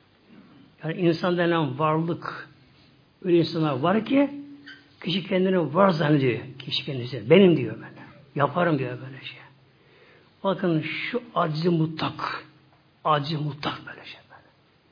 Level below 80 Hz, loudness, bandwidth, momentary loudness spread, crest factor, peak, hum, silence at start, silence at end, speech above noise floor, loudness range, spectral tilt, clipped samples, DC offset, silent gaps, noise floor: -68 dBFS; -24 LUFS; 5.2 kHz; 18 LU; 22 dB; -4 dBFS; none; 0.8 s; 0.55 s; 36 dB; 6 LU; -8.5 dB/octave; under 0.1%; under 0.1%; none; -59 dBFS